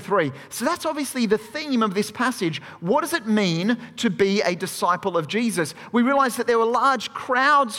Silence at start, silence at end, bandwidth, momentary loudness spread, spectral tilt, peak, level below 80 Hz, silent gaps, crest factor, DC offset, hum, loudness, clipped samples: 0 s; 0 s; 16.5 kHz; 7 LU; -4.5 dB/octave; -6 dBFS; -66 dBFS; none; 16 dB; under 0.1%; none; -22 LUFS; under 0.1%